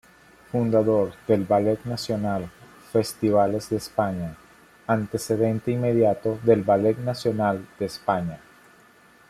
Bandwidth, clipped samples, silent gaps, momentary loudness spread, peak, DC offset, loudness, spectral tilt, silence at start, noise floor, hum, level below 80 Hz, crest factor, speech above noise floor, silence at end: 15 kHz; under 0.1%; none; 10 LU; -6 dBFS; under 0.1%; -24 LUFS; -7 dB/octave; 0.55 s; -54 dBFS; none; -58 dBFS; 20 dB; 31 dB; 0.9 s